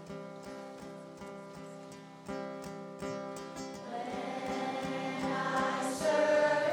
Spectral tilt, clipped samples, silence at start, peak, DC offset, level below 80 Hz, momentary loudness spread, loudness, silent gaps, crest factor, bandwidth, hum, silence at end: -4.5 dB/octave; under 0.1%; 0 s; -16 dBFS; under 0.1%; -68 dBFS; 19 LU; -35 LUFS; none; 18 dB; 17 kHz; none; 0 s